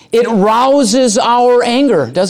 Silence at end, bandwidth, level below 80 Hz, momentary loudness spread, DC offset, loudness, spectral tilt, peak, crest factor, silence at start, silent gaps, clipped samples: 0 s; 14.5 kHz; -52 dBFS; 2 LU; under 0.1%; -10 LUFS; -4 dB/octave; -2 dBFS; 8 dB; 0.1 s; none; under 0.1%